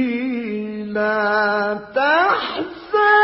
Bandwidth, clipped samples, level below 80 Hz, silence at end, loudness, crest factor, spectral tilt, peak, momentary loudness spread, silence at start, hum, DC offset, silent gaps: 5.8 kHz; under 0.1%; -58 dBFS; 0 s; -19 LUFS; 16 dB; -8.5 dB/octave; -2 dBFS; 10 LU; 0 s; none; under 0.1%; none